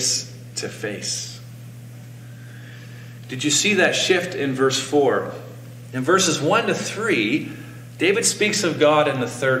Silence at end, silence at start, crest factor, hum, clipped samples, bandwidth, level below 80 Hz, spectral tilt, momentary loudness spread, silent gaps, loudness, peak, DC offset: 0 s; 0 s; 18 dB; 60 Hz at -40 dBFS; under 0.1%; 16.5 kHz; -62 dBFS; -3 dB/octave; 22 LU; none; -20 LUFS; -4 dBFS; under 0.1%